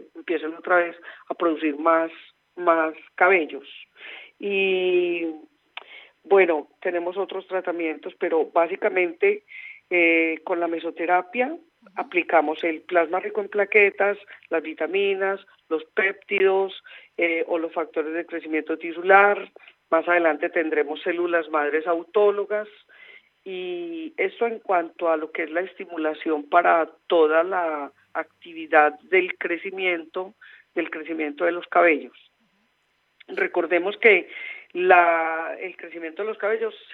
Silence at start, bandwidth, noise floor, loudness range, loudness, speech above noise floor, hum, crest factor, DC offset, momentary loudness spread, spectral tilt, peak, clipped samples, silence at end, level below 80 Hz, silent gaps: 0 s; 4.2 kHz; -69 dBFS; 4 LU; -23 LUFS; 46 dB; none; 22 dB; under 0.1%; 15 LU; -7 dB/octave; -2 dBFS; under 0.1%; 0 s; -88 dBFS; none